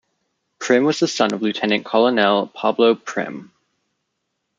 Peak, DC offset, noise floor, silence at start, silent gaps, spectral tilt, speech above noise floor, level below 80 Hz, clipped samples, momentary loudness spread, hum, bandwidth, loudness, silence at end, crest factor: -2 dBFS; under 0.1%; -75 dBFS; 0.6 s; none; -4.5 dB/octave; 57 dB; -68 dBFS; under 0.1%; 11 LU; none; 7.8 kHz; -18 LUFS; 1.15 s; 18 dB